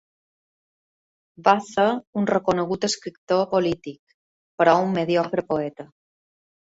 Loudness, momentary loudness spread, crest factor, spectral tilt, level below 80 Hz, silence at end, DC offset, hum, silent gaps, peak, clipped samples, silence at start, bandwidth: -22 LUFS; 10 LU; 22 dB; -5 dB/octave; -62 dBFS; 0.85 s; under 0.1%; none; 2.07-2.13 s, 3.18-3.27 s, 3.99-4.07 s, 4.14-4.58 s; -2 dBFS; under 0.1%; 1.4 s; 8 kHz